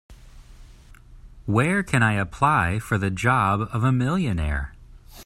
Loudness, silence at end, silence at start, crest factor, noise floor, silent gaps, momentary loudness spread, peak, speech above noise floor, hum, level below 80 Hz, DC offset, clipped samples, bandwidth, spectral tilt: -22 LUFS; 0 s; 0.1 s; 20 dB; -47 dBFS; none; 7 LU; -4 dBFS; 25 dB; none; -40 dBFS; under 0.1%; under 0.1%; 15 kHz; -6.5 dB/octave